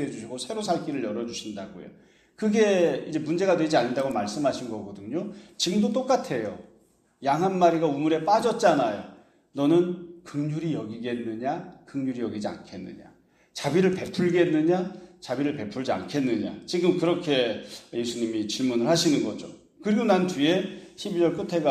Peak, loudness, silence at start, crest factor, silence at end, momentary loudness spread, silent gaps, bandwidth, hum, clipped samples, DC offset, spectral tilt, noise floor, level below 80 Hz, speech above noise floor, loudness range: -6 dBFS; -26 LUFS; 0 s; 20 dB; 0 s; 15 LU; none; 13 kHz; none; under 0.1%; under 0.1%; -5.5 dB/octave; -62 dBFS; -66 dBFS; 36 dB; 4 LU